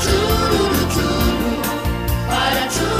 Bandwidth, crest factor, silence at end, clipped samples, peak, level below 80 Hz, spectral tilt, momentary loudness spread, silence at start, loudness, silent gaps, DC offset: 16 kHz; 14 dB; 0 s; under 0.1%; -4 dBFS; -26 dBFS; -4.5 dB/octave; 5 LU; 0 s; -18 LUFS; none; under 0.1%